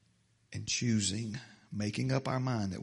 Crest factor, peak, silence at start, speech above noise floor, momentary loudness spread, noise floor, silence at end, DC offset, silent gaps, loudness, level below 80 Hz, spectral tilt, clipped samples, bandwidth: 18 dB; -16 dBFS; 0.5 s; 37 dB; 13 LU; -70 dBFS; 0 s; under 0.1%; none; -34 LUFS; -66 dBFS; -4.5 dB/octave; under 0.1%; 11.5 kHz